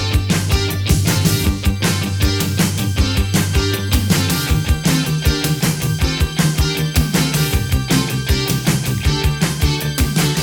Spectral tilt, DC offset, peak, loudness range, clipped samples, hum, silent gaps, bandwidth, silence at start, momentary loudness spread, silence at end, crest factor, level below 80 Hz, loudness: -4.5 dB/octave; under 0.1%; 0 dBFS; 0 LU; under 0.1%; none; none; over 20 kHz; 0 s; 2 LU; 0 s; 16 dB; -24 dBFS; -17 LUFS